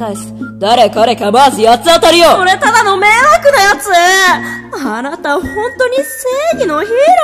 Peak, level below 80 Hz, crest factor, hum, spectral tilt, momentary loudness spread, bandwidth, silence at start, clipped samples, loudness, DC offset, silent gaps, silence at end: 0 dBFS; -40 dBFS; 10 dB; none; -2.5 dB/octave; 12 LU; 14.5 kHz; 0 s; 0.7%; -9 LUFS; under 0.1%; none; 0 s